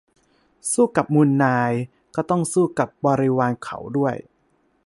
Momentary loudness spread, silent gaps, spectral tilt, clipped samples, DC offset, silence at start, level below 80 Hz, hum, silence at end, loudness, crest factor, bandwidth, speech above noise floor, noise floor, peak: 11 LU; none; -6.5 dB/octave; under 0.1%; under 0.1%; 0.65 s; -60 dBFS; none; 0.65 s; -21 LUFS; 18 dB; 11.5 kHz; 44 dB; -64 dBFS; -2 dBFS